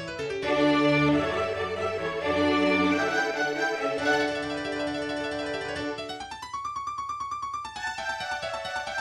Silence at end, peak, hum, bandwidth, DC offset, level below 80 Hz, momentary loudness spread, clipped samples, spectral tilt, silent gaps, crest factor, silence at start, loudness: 0 s; -12 dBFS; none; 12.5 kHz; under 0.1%; -56 dBFS; 10 LU; under 0.1%; -5 dB/octave; none; 16 dB; 0 s; -27 LUFS